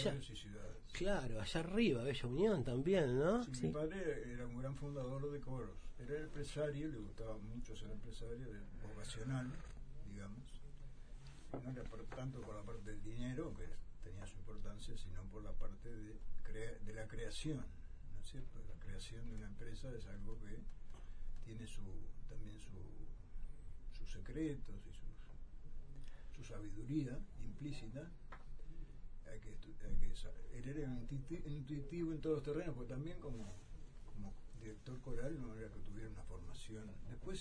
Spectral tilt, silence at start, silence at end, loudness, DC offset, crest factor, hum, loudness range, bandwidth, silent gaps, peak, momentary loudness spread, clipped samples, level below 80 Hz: -6.5 dB/octave; 0 s; 0 s; -47 LUFS; under 0.1%; 18 dB; none; 14 LU; 10 kHz; none; -24 dBFS; 17 LU; under 0.1%; -48 dBFS